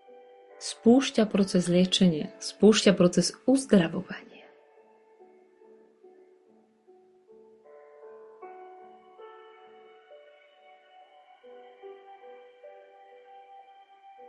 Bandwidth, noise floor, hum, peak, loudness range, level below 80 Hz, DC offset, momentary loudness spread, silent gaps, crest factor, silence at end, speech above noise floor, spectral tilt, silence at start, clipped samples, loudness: 11.5 kHz; -62 dBFS; none; -8 dBFS; 9 LU; -66 dBFS; under 0.1%; 28 LU; none; 22 dB; 1.6 s; 39 dB; -5 dB/octave; 0.6 s; under 0.1%; -24 LUFS